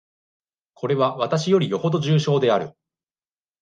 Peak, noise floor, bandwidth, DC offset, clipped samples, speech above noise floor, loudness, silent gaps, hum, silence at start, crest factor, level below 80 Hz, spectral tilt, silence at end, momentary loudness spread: -6 dBFS; under -90 dBFS; 9 kHz; under 0.1%; under 0.1%; over 70 dB; -21 LUFS; none; none; 0.8 s; 16 dB; -68 dBFS; -6.5 dB/octave; 0.9 s; 6 LU